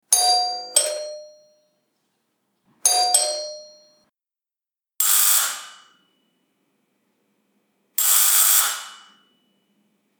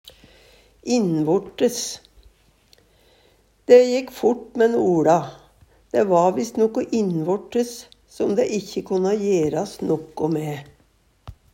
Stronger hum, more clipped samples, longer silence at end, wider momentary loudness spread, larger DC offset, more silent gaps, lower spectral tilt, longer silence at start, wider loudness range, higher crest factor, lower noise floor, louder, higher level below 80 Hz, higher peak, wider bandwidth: neither; neither; first, 1.25 s vs 0.2 s; first, 20 LU vs 12 LU; neither; neither; second, 4.5 dB/octave vs -5.5 dB/octave; second, 0.1 s vs 0.85 s; about the same, 4 LU vs 6 LU; about the same, 24 dB vs 20 dB; first, under -90 dBFS vs -60 dBFS; first, -17 LUFS vs -21 LUFS; second, under -90 dBFS vs -58 dBFS; about the same, 0 dBFS vs -2 dBFS; first, over 20 kHz vs 16 kHz